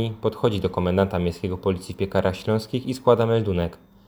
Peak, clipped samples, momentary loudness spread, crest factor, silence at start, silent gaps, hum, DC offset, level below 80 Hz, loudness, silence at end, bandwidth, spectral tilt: -2 dBFS; under 0.1%; 7 LU; 20 dB; 0 s; none; none; under 0.1%; -46 dBFS; -23 LUFS; 0.35 s; over 20 kHz; -7.5 dB/octave